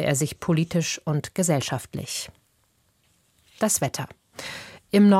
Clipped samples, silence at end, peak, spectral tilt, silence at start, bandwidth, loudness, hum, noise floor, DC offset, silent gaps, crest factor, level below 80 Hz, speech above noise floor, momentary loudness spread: under 0.1%; 0 s; -8 dBFS; -5 dB/octave; 0 s; 16 kHz; -25 LUFS; none; -66 dBFS; under 0.1%; none; 16 dB; -58 dBFS; 43 dB; 14 LU